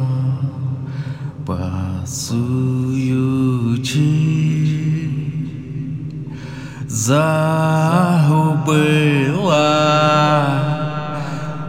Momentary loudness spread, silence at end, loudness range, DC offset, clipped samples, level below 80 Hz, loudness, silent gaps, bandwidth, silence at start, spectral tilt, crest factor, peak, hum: 13 LU; 0 s; 6 LU; under 0.1%; under 0.1%; -52 dBFS; -17 LUFS; none; 16 kHz; 0 s; -6 dB/octave; 16 dB; -2 dBFS; none